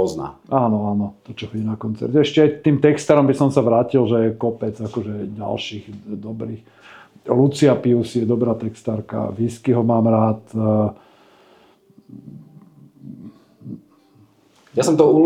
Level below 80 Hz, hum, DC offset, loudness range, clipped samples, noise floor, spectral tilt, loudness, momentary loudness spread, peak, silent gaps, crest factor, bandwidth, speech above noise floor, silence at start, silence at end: -60 dBFS; none; under 0.1%; 9 LU; under 0.1%; -54 dBFS; -7 dB/octave; -19 LUFS; 19 LU; 0 dBFS; none; 18 dB; 13 kHz; 36 dB; 0 s; 0 s